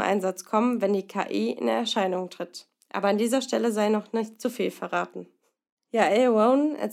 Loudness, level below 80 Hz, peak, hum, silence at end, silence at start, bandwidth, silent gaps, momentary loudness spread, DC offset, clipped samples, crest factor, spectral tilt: -25 LUFS; -88 dBFS; -8 dBFS; none; 0 s; 0 s; 15.5 kHz; 5.72-5.77 s; 14 LU; under 0.1%; under 0.1%; 18 dB; -5 dB/octave